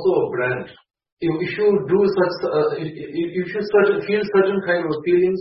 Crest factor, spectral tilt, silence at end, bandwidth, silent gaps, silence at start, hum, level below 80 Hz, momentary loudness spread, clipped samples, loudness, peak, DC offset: 16 dB; -10.5 dB/octave; 0 s; 5.8 kHz; 1.12-1.17 s; 0 s; none; -58 dBFS; 9 LU; under 0.1%; -20 LUFS; -4 dBFS; under 0.1%